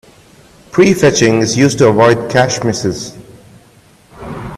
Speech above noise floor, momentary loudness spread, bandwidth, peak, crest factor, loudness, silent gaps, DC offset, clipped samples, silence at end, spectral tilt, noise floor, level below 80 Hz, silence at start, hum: 35 dB; 18 LU; 13.5 kHz; 0 dBFS; 14 dB; -11 LUFS; none; under 0.1%; under 0.1%; 0 s; -5 dB/octave; -45 dBFS; -44 dBFS; 0.75 s; none